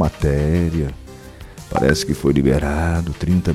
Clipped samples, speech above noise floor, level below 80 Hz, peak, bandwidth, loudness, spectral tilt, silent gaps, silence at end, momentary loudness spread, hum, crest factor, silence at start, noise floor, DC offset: under 0.1%; 20 dB; -28 dBFS; -2 dBFS; 15 kHz; -19 LUFS; -6.5 dB/octave; none; 0 s; 21 LU; none; 16 dB; 0 s; -37 dBFS; under 0.1%